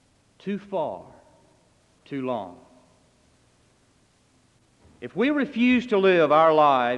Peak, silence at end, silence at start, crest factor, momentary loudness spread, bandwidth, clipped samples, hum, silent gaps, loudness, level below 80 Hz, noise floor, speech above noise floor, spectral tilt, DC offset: -6 dBFS; 0 s; 0.45 s; 18 dB; 20 LU; 8.8 kHz; under 0.1%; none; none; -22 LUFS; -66 dBFS; -62 dBFS; 41 dB; -7 dB/octave; under 0.1%